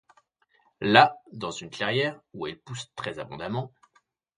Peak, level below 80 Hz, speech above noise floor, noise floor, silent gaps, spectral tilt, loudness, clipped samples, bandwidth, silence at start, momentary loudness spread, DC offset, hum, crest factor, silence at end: 0 dBFS; -66 dBFS; 41 dB; -68 dBFS; none; -4.5 dB/octave; -26 LUFS; under 0.1%; 10.5 kHz; 0.8 s; 18 LU; under 0.1%; none; 28 dB; 0.7 s